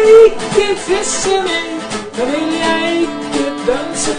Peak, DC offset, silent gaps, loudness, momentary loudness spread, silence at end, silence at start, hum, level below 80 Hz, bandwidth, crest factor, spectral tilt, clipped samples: 0 dBFS; under 0.1%; none; -14 LUFS; 9 LU; 0 s; 0 s; none; -40 dBFS; 10 kHz; 12 dB; -3 dB/octave; under 0.1%